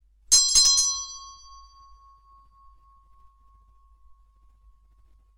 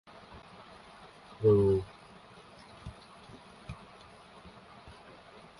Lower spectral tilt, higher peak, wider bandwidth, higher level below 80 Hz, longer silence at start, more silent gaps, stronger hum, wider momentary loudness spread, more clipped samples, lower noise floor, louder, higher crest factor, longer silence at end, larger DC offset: second, 3.5 dB/octave vs -8.5 dB/octave; first, -4 dBFS vs -14 dBFS; first, 16.5 kHz vs 11.5 kHz; about the same, -52 dBFS vs -56 dBFS; about the same, 0.3 s vs 0.35 s; neither; neither; about the same, 25 LU vs 27 LU; neither; about the same, -57 dBFS vs -54 dBFS; first, -18 LUFS vs -27 LUFS; about the same, 24 dB vs 22 dB; first, 4.05 s vs 0.7 s; neither